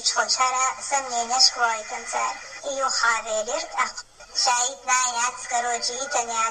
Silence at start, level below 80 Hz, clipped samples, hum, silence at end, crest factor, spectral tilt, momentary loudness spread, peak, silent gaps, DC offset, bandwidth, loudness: 0 s; -60 dBFS; under 0.1%; none; 0 s; 22 dB; 2 dB/octave; 11 LU; -2 dBFS; none; under 0.1%; 15 kHz; -23 LUFS